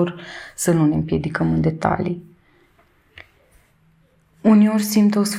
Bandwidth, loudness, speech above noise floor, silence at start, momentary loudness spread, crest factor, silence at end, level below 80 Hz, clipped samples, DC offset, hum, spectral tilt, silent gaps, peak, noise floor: 15 kHz; -18 LUFS; 40 dB; 0 s; 12 LU; 20 dB; 0 s; -48 dBFS; under 0.1%; under 0.1%; none; -6 dB/octave; none; 0 dBFS; -58 dBFS